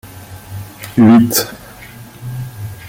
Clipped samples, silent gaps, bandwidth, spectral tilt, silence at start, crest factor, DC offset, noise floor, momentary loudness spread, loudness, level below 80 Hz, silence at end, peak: under 0.1%; none; 17 kHz; -5 dB/octave; 0.05 s; 16 dB; under 0.1%; -35 dBFS; 26 LU; -11 LUFS; -46 dBFS; 0 s; 0 dBFS